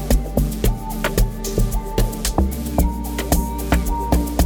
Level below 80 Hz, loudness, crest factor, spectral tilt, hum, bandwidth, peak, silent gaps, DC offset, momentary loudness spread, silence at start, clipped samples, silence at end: -22 dBFS; -22 LUFS; 18 dB; -5.5 dB/octave; none; 19 kHz; -2 dBFS; none; under 0.1%; 2 LU; 0 s; under 0.1%; 0 s